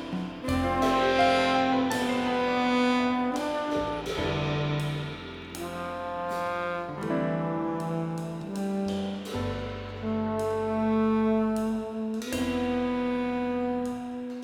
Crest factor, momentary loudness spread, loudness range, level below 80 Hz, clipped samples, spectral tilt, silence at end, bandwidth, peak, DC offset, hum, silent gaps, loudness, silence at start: 16 dB; 10 LU; 6 LU; -50 dBFS; under 0.1%; -6 dB/octave; 0 s; 16.5 kHz; -12 dBFS; under 0.1%; none; none; -28 LUFS; 0 s